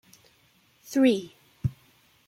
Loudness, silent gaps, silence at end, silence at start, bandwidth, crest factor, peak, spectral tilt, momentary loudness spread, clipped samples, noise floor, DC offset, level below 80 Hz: -27 LUFS; none; 0.55 s; 0.9 s; 16 kHz; 20 dB; -10 dBFS; -6.5 dB/octave; 11 LU; under 0.1%; -63 dBFS; under 0.1%; -56 dBFS